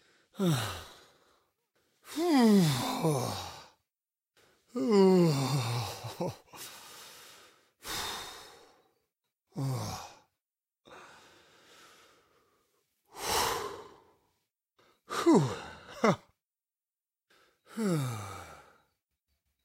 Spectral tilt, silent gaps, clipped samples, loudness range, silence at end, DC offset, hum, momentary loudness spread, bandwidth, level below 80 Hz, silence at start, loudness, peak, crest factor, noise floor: -5.5 dB/octave; none; under 0.1%; 13 LU; 1.05 s; under 0.1%; none; 24 LU; 16 kHz; -66 dBFS; 0.35 s; -30 LUFS; -12 dBFS; 22 dB; under -90 dBFS